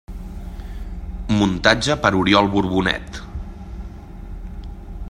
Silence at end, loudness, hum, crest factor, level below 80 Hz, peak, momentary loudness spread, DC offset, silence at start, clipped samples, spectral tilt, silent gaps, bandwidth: 0 s; -18 LUFS; none; 22 dB; -32 dBFS; 0 dBFS; 21 LU; under 0.1%; 0.1 s; under 0.1%; -5 dB/octave; none; 13 kHz